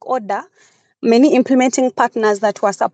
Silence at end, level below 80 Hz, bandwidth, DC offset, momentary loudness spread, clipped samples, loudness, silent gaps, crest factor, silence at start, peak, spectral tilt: 0.05 s; -80 dBFS; 9 kHz; under 0.1%; 10 LU; under 0.1%; -15 LUFS; none; 14 dB; 0.05 s; 0 dBFS; -4 dB/octave